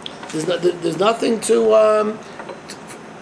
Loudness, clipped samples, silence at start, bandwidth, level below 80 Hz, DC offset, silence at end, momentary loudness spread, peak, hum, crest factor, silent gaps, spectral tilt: -17 LUFS; under 0.1%; 0 s; 11 kHz; -62 dBFS; under 0.1%; 0 s; 21 LU; -2 dBFS; none; 16 dB; none; -4.5 dB/octave